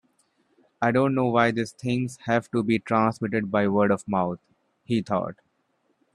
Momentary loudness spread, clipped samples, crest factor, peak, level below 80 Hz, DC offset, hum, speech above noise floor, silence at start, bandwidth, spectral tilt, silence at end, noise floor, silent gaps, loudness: 7 LU; under 0.1%; 20 dB; -6 dBFS; -62 dBFS; under 0.1%; none; 47 dB; 0.8 s; 11.5 kHz; -7 dB/octave; 0.8 s; -71 dBFS; none; -25 LUFS